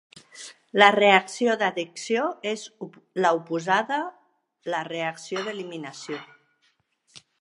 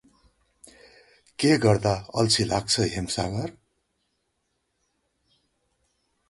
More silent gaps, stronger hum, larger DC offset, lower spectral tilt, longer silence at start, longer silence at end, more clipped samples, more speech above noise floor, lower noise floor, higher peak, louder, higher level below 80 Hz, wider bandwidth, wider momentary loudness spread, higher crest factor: neither; neither; neither; about the same, -3.5 dB/octave vs -4.5 dB/octave; second, 0.35 s vs 1.4 s; second, 0.25 s vs 2.8 s; neither; second, 45 dB vs 52 dB; second, -69 dBFS vs -76 dBFS; first, 0 dBFS vs -6 dBFS; about the same, -24 LUFS vs -24 LUFS; second, -80 dBFS vs -50 dBFS; about the same, 11.5 kHz vs 11.5 kHz; first, 20 LU vs 11 LU; about the same, 26 dB vs 22 dB